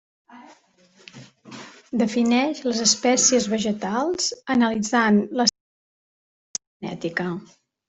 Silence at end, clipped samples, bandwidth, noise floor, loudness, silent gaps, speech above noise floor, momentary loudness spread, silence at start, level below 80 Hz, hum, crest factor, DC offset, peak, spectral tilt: 0.45 s; under 0.1%; 8.4 kHz; -57 dBFS; -21 LUFS; 5.60-6.54 s, 6.67-6.80 s; 36 dB; 17 LU; 0.3 s; -64 dBFS; none; 20 dB; under 0.1%; -4 dBFS; -3 dB/octave